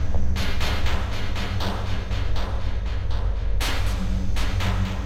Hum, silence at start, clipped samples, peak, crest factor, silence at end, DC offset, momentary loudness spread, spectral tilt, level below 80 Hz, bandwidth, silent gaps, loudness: none; 0 s; under 0.1%; -10 dBFS; 12 dB; 0 s; under 0.1%; 4 LU; -5 dB/octave; -26 dBFS; 14 kHz; none; -27 LUFS